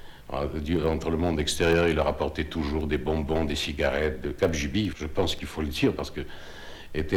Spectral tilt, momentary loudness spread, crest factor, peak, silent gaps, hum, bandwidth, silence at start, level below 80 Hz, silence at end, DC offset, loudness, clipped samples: -5.5 dB/octave; 12 LU; 18 dB; -10 dBFS; none; none; 17 kHz; 0 s; -38 dBFS; 0 s; under 0.1%; -27 LUFS; under 0.1%